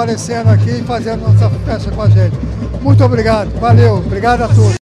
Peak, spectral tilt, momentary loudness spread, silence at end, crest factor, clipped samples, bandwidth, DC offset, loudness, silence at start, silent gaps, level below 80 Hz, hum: 0 dBFS; -7.5 dB/octave; 8 LU; 0.05 s; 10 dB; under 0.1%; 9.6 kHz; under 0.1%; -12 LUFS; 0 s; none; -26 dBFS; none